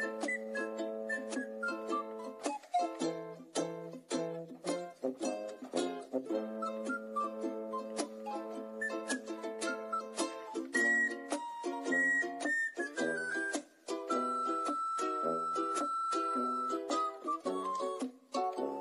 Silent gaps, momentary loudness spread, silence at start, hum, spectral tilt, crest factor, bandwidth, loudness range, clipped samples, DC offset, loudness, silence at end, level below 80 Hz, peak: none; 8 LU; 0 s; none; -3 dB/octave; 16 dB; 14 kHz; 6 LU; under 0.1%; under 0.1%; -36 LUFS; 0 s; under -90 dBFS; -20 dBFS